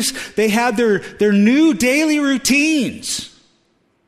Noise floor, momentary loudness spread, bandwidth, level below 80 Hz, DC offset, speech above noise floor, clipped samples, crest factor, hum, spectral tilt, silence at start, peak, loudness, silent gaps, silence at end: -61 dBFS; 10 LU; 15.5 kHz; -52 dBFS; under 0.1%; 46 dB; under 0.1%; 14 dB; none; -4 dB/octave; 0 s; -4 dBFS; -16 LUFS; none; 0.8 s